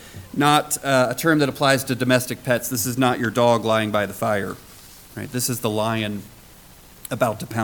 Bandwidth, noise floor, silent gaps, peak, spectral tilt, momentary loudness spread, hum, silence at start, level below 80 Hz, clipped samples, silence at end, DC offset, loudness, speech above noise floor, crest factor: 19 kHz; -46 dBFS; none; -4 dBFS; -4.5 dB/octave; 14 LU; none; 0 s; -54 dBFS; under 0.1%; 0 s; under 0.1%; -21 LUFS; 26 dB; 18 dB